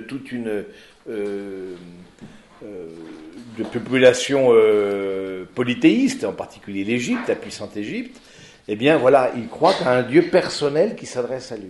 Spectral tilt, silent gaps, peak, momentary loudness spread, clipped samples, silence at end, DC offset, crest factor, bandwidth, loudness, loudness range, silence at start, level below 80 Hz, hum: -5 dB/octave; none; -2 dBFS; 22 LU; under 0.1%; 0 s; under 0.1%; 18 dB; 11.5 kHz; -20 LUFS; 13 LU; 0 s; -60 dBFS; none